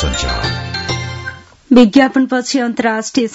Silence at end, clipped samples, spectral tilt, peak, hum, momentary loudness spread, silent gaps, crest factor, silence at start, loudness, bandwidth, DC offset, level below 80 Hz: 0 s; 0.3%; -5 dB/octave; 0 dBFS; none; 13 LU; none; 14 dB; 0 s; -14 LUFS; 8 kHz; under 0.1%; -30 dBFS